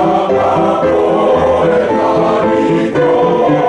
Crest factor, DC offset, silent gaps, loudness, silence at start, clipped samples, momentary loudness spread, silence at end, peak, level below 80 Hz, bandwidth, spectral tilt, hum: 8 dB; under 0.1%; none; -11 LUFS; 0 s; under 0.1%; 1 LU; 0 s; -2 dBFS; -42 dBFS; 9.8 kHz; -7 dB/octave; none